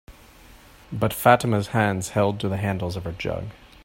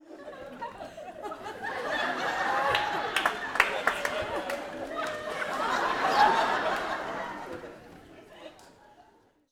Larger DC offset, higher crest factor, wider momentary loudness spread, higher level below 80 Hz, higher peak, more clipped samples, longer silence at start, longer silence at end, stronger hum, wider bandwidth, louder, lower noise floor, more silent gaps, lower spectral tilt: neither; about the same, 22 dB vs 26 dB; second, 13 LU vs 18 LU; first, -50 dBFS vs -60 dBFS; about the same, -2 dBFS vs -4 dBFS; neither; about the same, 0.1 s vs 0.05 s; second, 0.3 s vs 0.5 s; neither; second, 16.5 kHz vs over 20 kHz; first, -23 LUFS vs -29 LUFS; second, -49 dBFS vs -62 dBFS; neither; first, -6 dB/octave vs -2.5 dB/octave